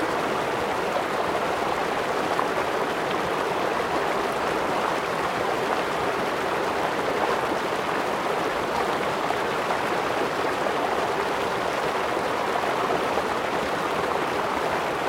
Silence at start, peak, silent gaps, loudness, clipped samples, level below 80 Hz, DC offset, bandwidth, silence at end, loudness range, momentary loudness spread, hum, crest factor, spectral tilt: 0 s; -8 dBFS; none; -25 LUFS; under 0.1%; -54 dBFS; under 0.1%; 16.5 kHz; 0 s; 0 LU; 1 LU; none; 18 dB; -4 dB/octave